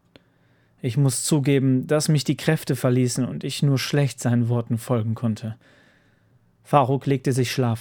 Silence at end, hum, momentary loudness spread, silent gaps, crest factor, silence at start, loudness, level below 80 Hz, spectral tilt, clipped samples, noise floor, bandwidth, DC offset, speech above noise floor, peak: 0 s; none; 7 LU; none; 20 dB; 0.85 s; -22 LUFS; -66 dBFS; -6 dB/octave; under 0.1%; -60 dBFS; 19.5 kHz; under 0.1%; 39 dB; -2 dBFS